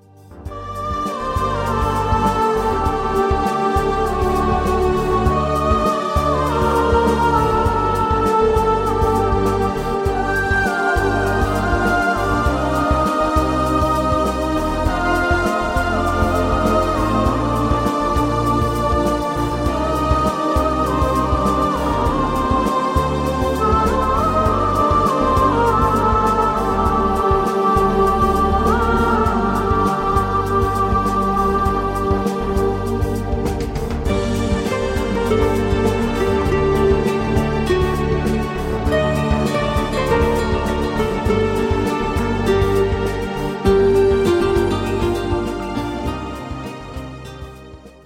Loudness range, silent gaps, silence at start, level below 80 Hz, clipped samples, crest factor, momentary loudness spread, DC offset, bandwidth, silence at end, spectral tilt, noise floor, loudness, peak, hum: 3 LU; none; 0.3 s; -26 dBFS; under 0.1%; 14 dB; 6 LU; under 0.1%; 16.5 kHz; 0.15 s; -6.5 dB/octave; -39 dBFS; -18 LUFS; -4 dBFS; none